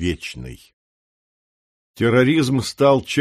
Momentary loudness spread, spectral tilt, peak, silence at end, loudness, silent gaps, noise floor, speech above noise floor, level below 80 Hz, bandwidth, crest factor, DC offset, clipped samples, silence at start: 17 LU; -6 dB/octave; -2 dBFS; 0 s; -18 LUFS; 0.73-1.94 s; under -90 dBFS; over 72 dB; -46 dBFS; 15 kHz; 18 dB; under 0.1%; under 0.1%; 0 s